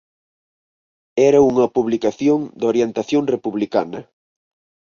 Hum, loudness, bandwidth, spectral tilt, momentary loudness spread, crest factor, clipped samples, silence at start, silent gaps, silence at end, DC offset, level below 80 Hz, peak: none; -18 LUFS; 7.2 kHz; -6.5 dB/octave; 9 LU; 16 dB; under 0.1%; 1.15 s; none; 0.9 s; under 0.1%; -58 dBFS; -2 dBFS